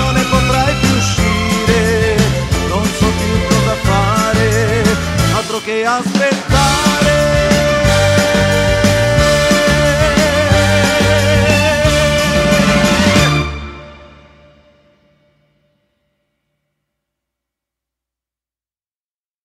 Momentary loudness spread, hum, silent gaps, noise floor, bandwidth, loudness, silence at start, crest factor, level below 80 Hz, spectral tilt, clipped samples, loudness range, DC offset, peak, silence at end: 4 LU; none; none; under -90 dBFS; 16 kHz; -12 LUFS; 0 s; 14 dB; -26 dBFS; -4.5 dB/octave; under 0.1%; 3 LU; under 0.1%; 0 dBFS; 5.4 s